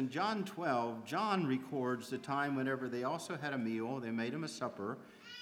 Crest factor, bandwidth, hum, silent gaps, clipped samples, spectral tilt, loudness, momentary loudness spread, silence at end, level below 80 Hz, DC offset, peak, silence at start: 18 dB; 16.5 kHz; none; none; under 0.1%; -5.5 dB/octave; -38 LUFS; 6 LU; 0 s; -86 dBFS; under 0.1%; -20 dBFS; 0 s